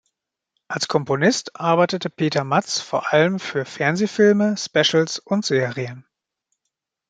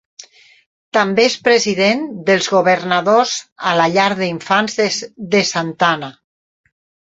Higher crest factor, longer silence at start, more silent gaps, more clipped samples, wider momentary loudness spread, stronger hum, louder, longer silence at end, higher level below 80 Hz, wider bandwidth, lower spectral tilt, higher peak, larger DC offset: about the same, 18 dB vs 16 dB; second, 0.7 s vs 0.95 s; second, none vs 3.52-3.56 s; neither; about the same, 9 LU vs 7 LU; neither; second, -20 LUFS vs -15 LUFS; about the same, 1.1 s vs 1 s; second, -68 dBFS vs -60 dBFS; first, 9.2 kHz vs 8 kHz; about the same, -4.5 dB/octave vs -3.5 dB/octave; about the same, -2 dBFS vs 0 dBFS; neither